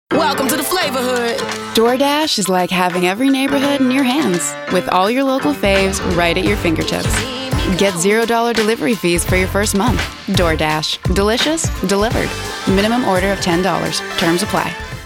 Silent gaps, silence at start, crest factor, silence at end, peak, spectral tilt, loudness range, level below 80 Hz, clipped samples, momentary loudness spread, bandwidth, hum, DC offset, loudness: none; 0.1 s; 14 dB; 0 s; -2 dBFS; -4 dB/octave; 1 LU; -30 dBFS; under 0.1%; 4 LU; over 20 kHz; none; under 0.1%; -16 LUFS